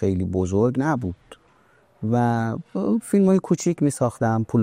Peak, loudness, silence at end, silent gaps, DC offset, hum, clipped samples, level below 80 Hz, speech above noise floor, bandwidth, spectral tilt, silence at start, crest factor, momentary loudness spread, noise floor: -8 dBFS; -22 LUFS; 0 s; none; under 0.1%; none; under 0.1%; -52 dBFS; 37 dB; 15.5 kHz; -7.5 dB/octave; 0 s; 14 dB; 8 LU; -58 dBFS